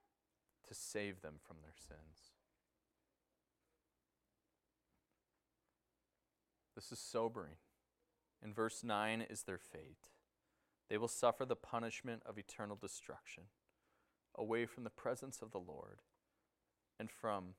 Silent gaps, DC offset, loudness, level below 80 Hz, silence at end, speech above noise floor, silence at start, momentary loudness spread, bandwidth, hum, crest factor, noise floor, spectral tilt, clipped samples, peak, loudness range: none; under 0.1%; -45 LUFS; -78 dBFS; 0.05 s; 44 dB; 0.65 s; 20 LU; 16 kHz; none; 28 dB; -90 dBFS; -4 dB/octave; under 0.1%; -22 dBFS; 10 LU